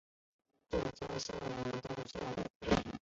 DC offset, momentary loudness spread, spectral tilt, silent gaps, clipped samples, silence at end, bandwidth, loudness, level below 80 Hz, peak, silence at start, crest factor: under 0.1%; 7 LU; -4.5 dB/octave; 2.50-2.60 s; under 0.1%; 0.05 s; 7.6 kHz; -40 LUFS; -54 dBFS; -18 dBFS; 0.7 s; 22 dB